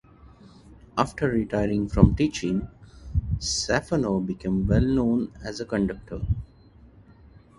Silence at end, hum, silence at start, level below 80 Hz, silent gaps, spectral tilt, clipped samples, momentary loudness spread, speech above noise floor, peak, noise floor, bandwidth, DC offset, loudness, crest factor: 1.15 s; none; 0.7 s; -36 dBFS; none; -6 dB/octave; under 0.1%; 11 LU; 28 dB; 0 dBFS; -52 dBFS; 11.5 kHz; under 0.1%; -25 LUFS; 26 dB